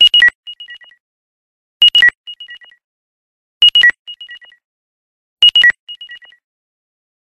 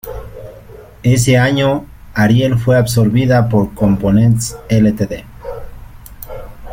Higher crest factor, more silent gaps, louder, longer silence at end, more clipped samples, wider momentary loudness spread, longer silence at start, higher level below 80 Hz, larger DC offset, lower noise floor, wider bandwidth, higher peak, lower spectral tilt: about the same, 14 dB vs 14 dB; first, 0.35-0.43 s, 1.00-1.80 s, 2.17-2.24 s, 2.84-3.61 s, 3.99-4.05 s, 4.64-5.37 s, 5.79-5.87 s vs none; first, -8 LUFS vs -13 LUFS; first, 1.05 s vs 0 s; neither; first, 25 LU vs 20 LU; about the same, 0 s vs 0.05 s; second, -58 dBFS vs -34 dBFS; neither; about the same, -36 dBFS vs -36 dBFS; second, 13 kHz vs 16.5 kHz; about the same, 0 dBFS vs 0 dBFS; second, 2 dB/octave vs -6.5 dB/octave